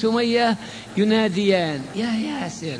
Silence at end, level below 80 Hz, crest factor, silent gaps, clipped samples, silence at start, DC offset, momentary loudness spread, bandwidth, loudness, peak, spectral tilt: 0 s; -58 dBFS; 16 dB; none; under 0.1%; 0 s; under 0.1%; 9 LU; 10.5 kHz; -22 LUFS; -6 dBFS; -5.5 dB/octave